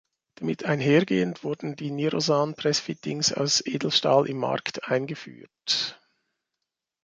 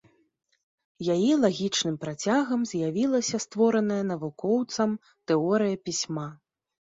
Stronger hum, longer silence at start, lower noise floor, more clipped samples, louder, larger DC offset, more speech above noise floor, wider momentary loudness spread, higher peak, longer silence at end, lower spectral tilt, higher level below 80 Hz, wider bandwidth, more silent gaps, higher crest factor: neither; second, 0.4 s vs 1 s; first, -85 dBFS vs -70 dBFS; neither; about the same, -25 LUFS vs -26 LUFS; neither; first, 59 dB vs 44 dB; first, 11 LU vs 8 LU; first, -6 dBFS vs -10 dBFS; first, 1.1 s vs 0.55 s; about the same, -4 dB/octave vs -4.5 dB/octave; about the same, -68 dBFS vs -70 dBFS; first, 9.6 kHz vs 7.8 kHz; neither; about the same, 20 dB vs 16 dB